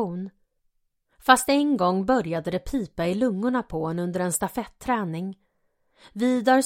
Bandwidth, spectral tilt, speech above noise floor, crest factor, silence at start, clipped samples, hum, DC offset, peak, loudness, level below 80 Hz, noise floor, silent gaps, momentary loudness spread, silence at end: 16.5 kHz; -4.5 dB/octave; 47 dB; 24 dB; 0 s; under 0.1%; none; under 0.1%; 0 dBFS; -24 LUFS; -50 dBFS; -71 dBFS; none; 12 LU; 0 s